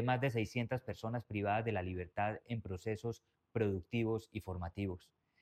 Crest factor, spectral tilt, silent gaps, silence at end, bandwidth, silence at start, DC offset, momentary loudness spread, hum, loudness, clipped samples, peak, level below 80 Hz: 16 dB; -7.5 dB/octave; none; 0.45 s; 13.5 kHz; 0 s; under 0.1%; 9 LU; none; -39 LUFS; under 0.1%; -22 dBFS; -62 dBFS